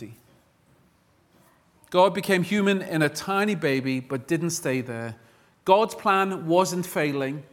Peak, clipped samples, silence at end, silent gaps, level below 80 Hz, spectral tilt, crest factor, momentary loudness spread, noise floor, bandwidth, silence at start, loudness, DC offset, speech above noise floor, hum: -4 dBFS; under 0.1%; 0.1 s; none; -68 dBFS; -5 dB/octave; 22 dB; 9 LU; -62 dBFS; 18 kHz; 0 s; -24 LUFS; under 0.1%; 39 dB; none